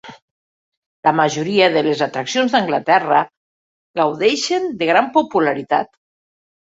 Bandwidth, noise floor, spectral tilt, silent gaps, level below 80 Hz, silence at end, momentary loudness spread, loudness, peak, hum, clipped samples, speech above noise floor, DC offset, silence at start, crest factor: 7.8 kHz; under -90 dBFS; -4 dB/octave; 0.22-1.03 s, 3.37-3.94 s; -64 dBFS; 0.8 s; 6 LU; -17 LUFS; -2 dBFS; none; under 0.1%; over 74 dB; under 0.1%; 0.05 s; 18 dB